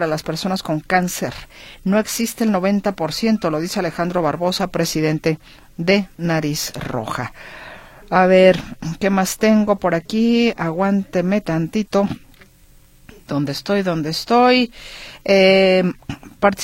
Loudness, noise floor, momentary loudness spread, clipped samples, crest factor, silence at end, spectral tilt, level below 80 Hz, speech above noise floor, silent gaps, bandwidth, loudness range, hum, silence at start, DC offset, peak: -18 LUFS; -48 dBFS; 15 LU; under 0.1%; 18 dB; 0 s; -5 dB/octave; -46 dBFS; 31 dB; none; 16.5 kHz; 5 LU; none; 0 s; under 0.1%; 0 dBFS